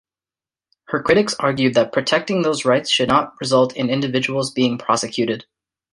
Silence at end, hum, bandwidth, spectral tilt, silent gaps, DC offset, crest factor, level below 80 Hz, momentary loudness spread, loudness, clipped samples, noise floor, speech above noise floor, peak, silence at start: 0.5 s; none; 11.5 kHz; -4.5 dB/octave; none; under 0.1%; 18 dB; -56 dBFS; 6 LU; -18 LUFS; under 0.1%; under -90 dBFS; over 72 dB; -2 dBFS; 0.9 s